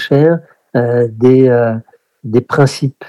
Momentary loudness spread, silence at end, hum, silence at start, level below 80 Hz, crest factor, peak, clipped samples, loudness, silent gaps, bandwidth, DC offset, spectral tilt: 10 LU; 0.05 s; none; 0 s; -54 dBFS; 12 dB; 0 dBFS; 0.3%; -12 LUFS; none; 12.5 kHz; under 0.1%; -7.5 dB/octave